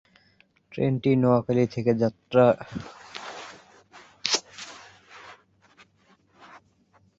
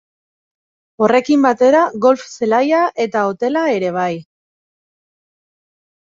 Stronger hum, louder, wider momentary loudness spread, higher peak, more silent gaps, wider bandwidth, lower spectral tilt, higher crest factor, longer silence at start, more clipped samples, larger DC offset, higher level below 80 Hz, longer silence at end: neither; second, -24 LUFS vs -15 LUFS; first, 23 LU vs 7 LU; about the same, -4 dBFS vs -2 dBFS; neither; about the same, 8 kHz vs 7.6 kHz; about the same, -5.5 dB/octave vs -5.5 dB/octave; first, 24 dB vs 16 dB; second, 0.75 s vs 1 s; neither; neither; about the same, -62 dBFS vs -64 dBFS; second, 1.85 s vs 2 s